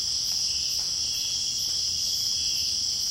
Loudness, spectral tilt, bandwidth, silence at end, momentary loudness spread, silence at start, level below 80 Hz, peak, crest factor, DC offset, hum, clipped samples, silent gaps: -24 LUFS; 1.5 dB/octave; 16.5 kHz; 0 s; 1 LU; 0 s; -54 dBFS; -14 dBFS; 14 dB; under 0.1%; none; under 0.1%; none